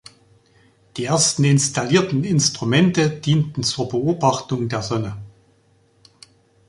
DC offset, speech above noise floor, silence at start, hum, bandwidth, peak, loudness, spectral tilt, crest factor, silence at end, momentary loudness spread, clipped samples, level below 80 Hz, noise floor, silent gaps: under 0.1%; 39 dB; 0.95 s; none; 11.5 kHz; -2 dBFS; -19 LUFS; -4.5 dB/octave; 18 dB; 1.4 s; 9 LU; under 0.1%; -54 dBFS; -58 dBFS; none